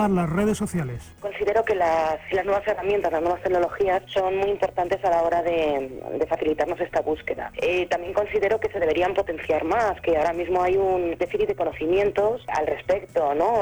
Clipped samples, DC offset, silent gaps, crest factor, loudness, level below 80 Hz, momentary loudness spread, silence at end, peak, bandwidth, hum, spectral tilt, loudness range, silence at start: under 0.1%; under 0.1%; none; 12 dB; -24 LUFS; -48 dBFS; 5 LU; 0 s; -10 dBFS; over 20 kHz; none; -6 dB/octave; 1 LU; 0 s